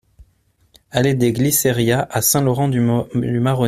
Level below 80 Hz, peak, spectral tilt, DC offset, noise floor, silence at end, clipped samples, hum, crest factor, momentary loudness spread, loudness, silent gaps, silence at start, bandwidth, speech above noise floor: -48 dBFS; -2 dBFS; -5 dB/octave; under 0.1%; -60 dBFS; 0 s; under 0.1%; none; 16 dB; 4 LU; -17 LUFS; none; 0.95 s; 16 kHz; 43 dB